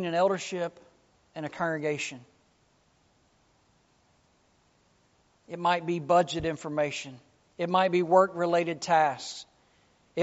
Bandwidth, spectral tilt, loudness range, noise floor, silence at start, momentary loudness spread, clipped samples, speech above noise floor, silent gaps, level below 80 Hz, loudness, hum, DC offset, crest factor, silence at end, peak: 8 kHz; -4 dB/octave; 10 LU; -67 dBFS; 0 s; 16 LU; under 0.1%; 40 dB; none; -64 dBFS; -28 LUFS; none; under 0.1%; 22 dB; 0 s; -8 dBFS